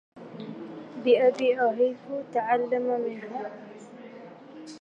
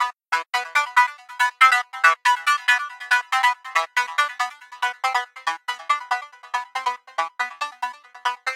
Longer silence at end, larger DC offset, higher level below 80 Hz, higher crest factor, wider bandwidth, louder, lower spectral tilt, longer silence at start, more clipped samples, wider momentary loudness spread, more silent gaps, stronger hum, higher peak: about the same, 0 s vs 0 s; neither; first, -82 dBFS vs under -90 dBFS; about the same, 18 dB vs 22 dB; second, 7.8 kHz vs 16.5 kHz; second, -26 LUFS vs -21 LUFS; first, -5.5 dB/octave vs 4.5 dB/octave; first, 0.15 s vs 0 s; neither; first, 23 LU vs 12 LU; neither; neither; second, -10 dBFS vs 0 dBFS